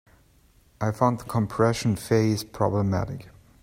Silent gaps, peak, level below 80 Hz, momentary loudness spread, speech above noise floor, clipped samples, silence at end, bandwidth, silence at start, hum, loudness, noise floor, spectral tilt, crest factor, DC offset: none; -6 dBFS; -52 dBFS; 8 LU; 35 dB; under 0.1%; 0.35 s; 16 kHz; 0.8 s; none; -25 LUFS; -59 dBFS; -6.5 dB/octave; 20 dB; under 0.1%